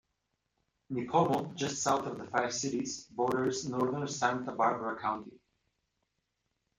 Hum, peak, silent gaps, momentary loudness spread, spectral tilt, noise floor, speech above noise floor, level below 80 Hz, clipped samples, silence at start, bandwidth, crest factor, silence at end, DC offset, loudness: none; -12 dBFS; none; 7 LU; -4 dB/octave; -82 dBFS; 50 dB; -70 dBFS; under 0.1%; 0.9 s; 16 kHz; 22 dB; 1.45 s; under 0.1%; -33 LUFS